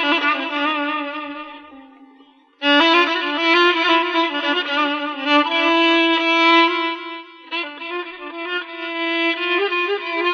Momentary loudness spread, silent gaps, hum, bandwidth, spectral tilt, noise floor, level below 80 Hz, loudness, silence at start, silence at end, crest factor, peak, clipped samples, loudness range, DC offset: 14 LU; none; none; 7 kHz; -1.5 dB/octave; -51 dBFS; -70 dBFS; -17 LUFS; 0 s; 0 s; 16 dB; -4 dBFS; under 0.1%; 6 LU; under 0.1%